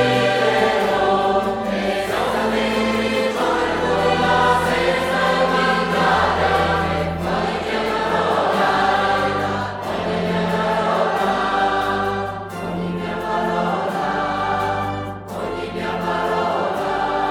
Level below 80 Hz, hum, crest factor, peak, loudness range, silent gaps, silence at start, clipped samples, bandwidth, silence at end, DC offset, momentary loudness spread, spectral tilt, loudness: -42 dBFS; none; 16 dB; -4 dBFS; 5 LU; none; 0 s; under 0.1%; 17.5 kHz; 0 s; under 0.1%; 8 LU; -5 dB/octave; -19 LUFS